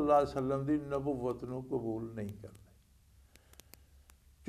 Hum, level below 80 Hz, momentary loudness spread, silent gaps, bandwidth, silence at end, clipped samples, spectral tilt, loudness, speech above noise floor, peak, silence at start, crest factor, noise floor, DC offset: none; -60 dBFS; 22 LU; none; 14.5 kHz; 0 s; under 0.1%; -8 dB/octave; -35 LUFS; 30 dB; -16 dBFS; 0 s; 20 dB; -64 dBFS; under 0.1%